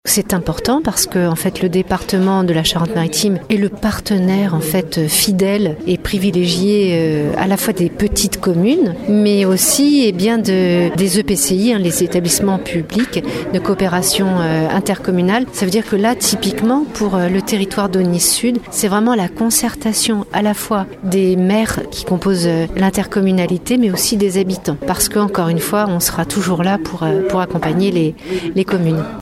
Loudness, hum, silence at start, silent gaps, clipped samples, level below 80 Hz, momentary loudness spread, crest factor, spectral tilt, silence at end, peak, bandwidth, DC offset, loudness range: -15 LUFS; none; 0.05 s; none; under 0.1%; -38 dBFS; 5 LU; 14 dB; -4.5 dB/octave; 0 s; 0 dBFS; 16 kHz; under 0.1%; 3 LU